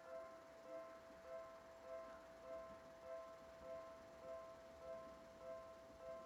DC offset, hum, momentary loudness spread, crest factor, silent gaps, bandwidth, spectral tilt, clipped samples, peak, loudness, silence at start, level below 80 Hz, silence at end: under 0.1%; none; 4 LU; 14 dB; none; 14.5 kHz; -4.5 dB/octave; under 0.1%; -44 dBFS; -57 LUFS; 0 s; -78 dBFS; 0 s